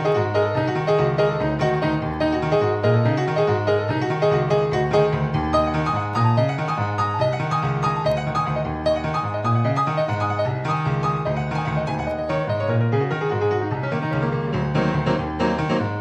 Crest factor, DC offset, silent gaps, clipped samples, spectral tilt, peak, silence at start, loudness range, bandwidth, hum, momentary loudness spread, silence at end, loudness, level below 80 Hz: 16 dB; under 0.1%; none; under 0.1%; -7.5 dB/octave; -4 dBFS; 0 s; 3 LU; 8.8 kHz; none; 4 LU; 0 s; -22 LUFS; -42 dBFS